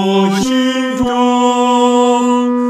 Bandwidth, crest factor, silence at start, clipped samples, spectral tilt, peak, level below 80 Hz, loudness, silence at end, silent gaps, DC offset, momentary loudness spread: 12.5 kHz; 12 dB; 0 s; under 0.1%; -5 dB/octave; 0 dBFS; -46 dBFS; -12 LUFS; 0 s; none; under 0.1%; 4 LU